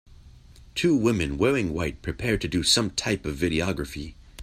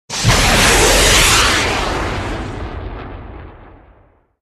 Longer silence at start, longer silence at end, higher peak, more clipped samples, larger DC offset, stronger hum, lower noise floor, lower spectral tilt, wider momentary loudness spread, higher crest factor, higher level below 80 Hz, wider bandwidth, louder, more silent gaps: first, 0.25 s vs 0.1 s; second, 0 s vs 0.85 s; second, -8 dBFS vs 0 dBFS; neither; neither; neither; about the same, -49 dBFS vs -51 dBFS; first, -4 dB/octave vs -2.5 dB/octave; second, 12 LU vs 21 LU; about the same, 18 dB vs 16 dB; second, -42 dBFS vs -24 dBFS; first, 15.5 kHz vs 14 kHz; second, -25 LUFS vs -12 LUFS; neither